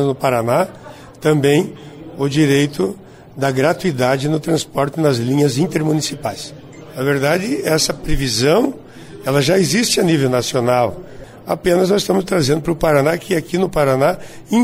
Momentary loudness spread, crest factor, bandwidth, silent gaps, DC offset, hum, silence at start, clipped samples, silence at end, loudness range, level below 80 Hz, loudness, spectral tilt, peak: 14 LU; 14 dB; 16 kHz; none; under 0.1%; none; 0 s; under 0.1%; 0 s; 2 LU; -36 dBFS; -17 LUFS; -5 dB/octave; -4 dBFS